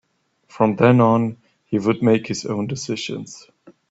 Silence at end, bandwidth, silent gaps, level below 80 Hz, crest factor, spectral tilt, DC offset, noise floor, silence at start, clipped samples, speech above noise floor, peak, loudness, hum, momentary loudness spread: 0.2 s; 8 kHz; none; -58 dBFS; 18 dB; -6.5 dB/octave; under 0.1%; -60 dBFS; 0.55 s; under 0.1%; 41 dB; -2 dBFS; -19 LUFS; none; 13 LU